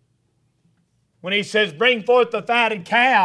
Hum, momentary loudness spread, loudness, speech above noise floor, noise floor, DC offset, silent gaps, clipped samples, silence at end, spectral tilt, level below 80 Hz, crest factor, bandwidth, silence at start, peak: none; 7 LU; -18 LUFS; 48 dB; -66 dBFS; under 0.1%; none; under 0.1%; 0 s; -4 dB/octave; -72 dBFS; 18 dB; 11 kHz; 1.25 s; -2 dBFS